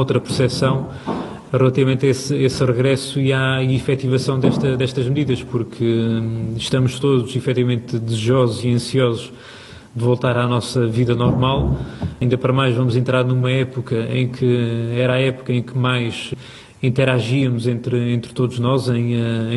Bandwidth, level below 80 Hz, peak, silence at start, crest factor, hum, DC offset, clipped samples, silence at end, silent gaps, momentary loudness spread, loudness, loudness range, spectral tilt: 12 kHz; -42 dBFS; -2 dBFS; 0 s; 16 dB; none; under 0.1%; under 0.1%; 0 s; none; 7 LU; -19 LUFS; 2 LU; -6.5 dB/octave